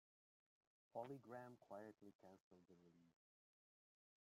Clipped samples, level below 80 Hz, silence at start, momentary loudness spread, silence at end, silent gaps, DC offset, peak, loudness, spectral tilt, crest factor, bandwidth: under 0.1%; under -90 dBFS; 0.95 s; 12 LU; 1.1 s; 2.15-2.19 s, 2.40-2.51 s; under 0.1%; -38 dBFS; -59 LUFS; -7 dB/octave; 24 dB; 14.5 kHz